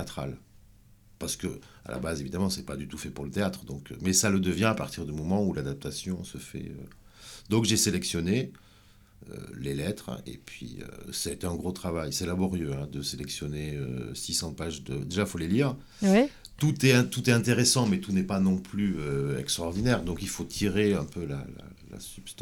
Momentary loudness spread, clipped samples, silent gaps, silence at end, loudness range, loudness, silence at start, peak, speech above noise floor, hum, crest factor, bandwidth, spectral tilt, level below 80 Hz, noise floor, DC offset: 18 LU; under 0.1%; none; 0 s; 9 LU; -29 LUFS; 0 s; -8 dBFS; 28 dB; none; 22 dB; 18 kHz; -4.5 dB/octave; -50 dBFS; -57 dBFS; under 0.1%